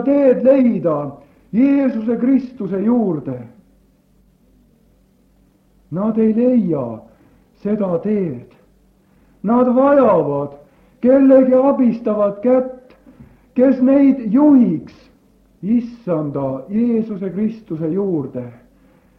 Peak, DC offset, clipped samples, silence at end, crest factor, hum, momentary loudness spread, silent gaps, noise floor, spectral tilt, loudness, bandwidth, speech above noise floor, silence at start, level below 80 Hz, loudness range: -2 dBFS; under 0.1%; under 0.1%; 0.65 s; 16 dB; none; 15 LU; none; -55 dBFS; -11 dB/octave; -16 LUFS; 4.2 kHz; 40 dB; 0 s; -56 dBFS; 7 LU